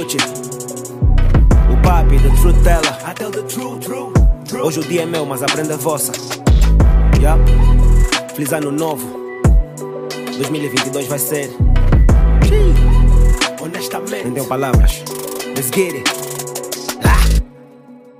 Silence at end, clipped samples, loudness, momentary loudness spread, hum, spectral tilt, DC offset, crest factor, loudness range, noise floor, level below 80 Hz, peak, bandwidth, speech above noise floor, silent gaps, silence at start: 0.25 s; under 0.1%; -16 LUFS; 11 LU; none; -5 dB/octave; under 0.1%; 12 dB; 4 LU; -40 dBFS; -14 dBFS; -2 dBFS; 16 kHz; 26 dB; none; 0 s